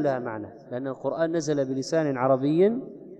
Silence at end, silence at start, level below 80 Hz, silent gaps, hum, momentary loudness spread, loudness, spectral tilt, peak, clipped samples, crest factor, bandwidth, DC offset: 0 s; 0 s; -70 dBFS; none; none; 12 LU; -26 LUFS; -6.5 dB/octave; -10 dBFS; under 0.1%; 16 dB; 9.2 kHz; under 0.1%